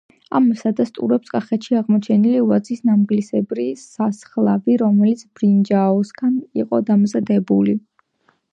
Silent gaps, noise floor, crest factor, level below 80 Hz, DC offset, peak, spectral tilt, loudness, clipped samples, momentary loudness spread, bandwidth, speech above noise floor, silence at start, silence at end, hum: none; -63 dBFS; 14 dB; -66 dBFS; under 0.1%; -4 dBFS; -8.5 dB/octave; -18 LUFS; under 0.1%; 7 LU; 8 kHz; 46 dB; 0.3 s; 0.75 s; none